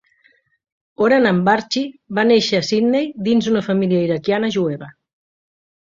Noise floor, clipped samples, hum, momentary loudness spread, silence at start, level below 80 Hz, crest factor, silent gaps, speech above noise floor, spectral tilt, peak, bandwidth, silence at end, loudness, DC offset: -59 dBFS; under 0.1%; none; 9 LU; 1 s; -60 dBFS; 18 dB; none; 42 dB; -5.5 dB/octave; 0 dBFS; 7.6 kHz; 1.05 s; -17 LUFS; under 0.1%